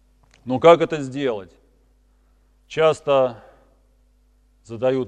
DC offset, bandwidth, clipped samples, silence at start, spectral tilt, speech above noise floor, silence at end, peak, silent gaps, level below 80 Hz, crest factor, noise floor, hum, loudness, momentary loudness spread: under 0.1%; 9.6 kHz; under 0.1%; 0.45 s; -6 dB/octave; 39 dB; 0 s; 0 dBFS; none; -58 dBFS; 22 dB; -58 dBFS; none; -19 LUFS; 18 LU